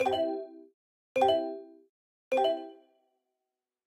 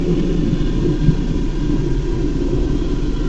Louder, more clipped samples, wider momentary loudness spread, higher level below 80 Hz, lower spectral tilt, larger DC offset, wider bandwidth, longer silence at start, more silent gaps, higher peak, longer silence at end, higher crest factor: second, -30 LUFS vs -20 LUFS; neither; first, 19 LU vs 4 LU; second, -74 dBFS vs -20 dBFS; second, -4.5 dB/octave vs -8 dB/octave; neither; first, 15 kHz vs 7.8 kHz; about the same, 0 s vs 0 s; first, 0.74-1.15 s, 1.89-2.31 s vs none; second, -12 dBFS vs -2 dBFS; first, 1.1 s vs 0 s; about the same, 20 dB vs 16 dB